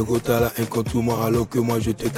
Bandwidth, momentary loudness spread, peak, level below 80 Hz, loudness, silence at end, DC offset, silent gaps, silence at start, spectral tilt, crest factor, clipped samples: 17 kHz; 2 LU; -6 dBFS; -40 dBFS; -22 LUFS; 0 s; under 0.1%; none; 0 s; -6.5 dB/octave; 14 dB; under 0.1%